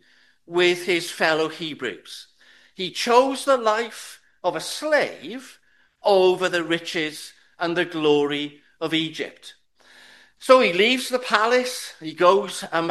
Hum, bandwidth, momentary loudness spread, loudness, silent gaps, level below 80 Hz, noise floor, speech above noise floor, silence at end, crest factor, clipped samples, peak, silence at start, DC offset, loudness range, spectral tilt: none; 12.5 kHz; 16 LU; -21 LUFS; none; -74 dBFS; -53 dBFS; 31 dB; 0 s; 22 dB; under 0.1%; 0 dBFS; 0.5 s; under 0.1%; 4 LU; -3.5 dB/octave